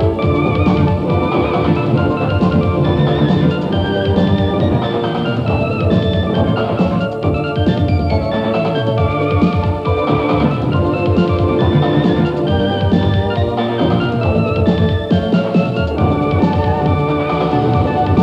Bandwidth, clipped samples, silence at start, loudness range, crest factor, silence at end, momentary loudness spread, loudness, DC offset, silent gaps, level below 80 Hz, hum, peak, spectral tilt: 7.2 kHz; under 0.1%; 0 s; 1 LU; 14 dB; 0 s; 3 LU; -15 LUFS; under 0.1%; none; -30 dBFS; none; 0 dBFS; -9 dB/octave